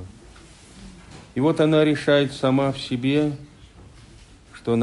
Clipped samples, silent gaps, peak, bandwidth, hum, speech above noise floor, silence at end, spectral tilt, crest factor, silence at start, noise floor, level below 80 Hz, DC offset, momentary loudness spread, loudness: under 0.1%; none; -6 dBFS; 11.5 kHz; none; 27 dB; 0 s; -6.5 dB/octave; 16 dB; 0 s; -47 dBFS; -52 dBFS; under 0.1%; 16 LU; -21 LUFS